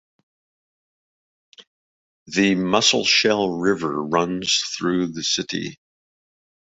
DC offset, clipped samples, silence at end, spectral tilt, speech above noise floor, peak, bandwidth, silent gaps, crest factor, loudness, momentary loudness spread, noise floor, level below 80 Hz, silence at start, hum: under 0.1%; under 0.1%; 1 s; -3 dB/octave; over 69 dB; -2 dBFS; 8.2 kHz; 1.67-2.26 s; 22 dB; -20 LUFS; 9 LU; under -90 dBFS; -60 dBFS; 1.6 s; none